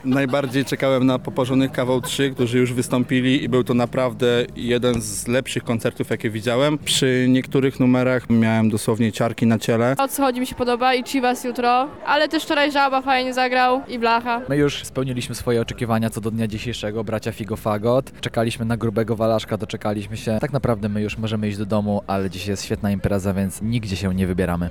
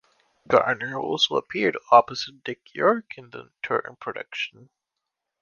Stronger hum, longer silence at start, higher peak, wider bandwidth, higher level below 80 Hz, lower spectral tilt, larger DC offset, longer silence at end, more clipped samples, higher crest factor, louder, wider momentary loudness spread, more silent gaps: neither; second, 0.05 s vs 0.5 s; second, -8 dBFS vs -2 dBFS; first, 18.5 kHz vs 7.2 kHz; first, -46 dBFS vs -66 dBFS; first, -5.5 dB/octave vs -4 dB/octave; first, 0.4% vs under 0.1%; second, 0 s vs 0.95 s; neither; second, 12 dB vs 24 dB; about the same, -21 LUFS vs -23 LUFS; second, 7 LU vs 17 LU; neither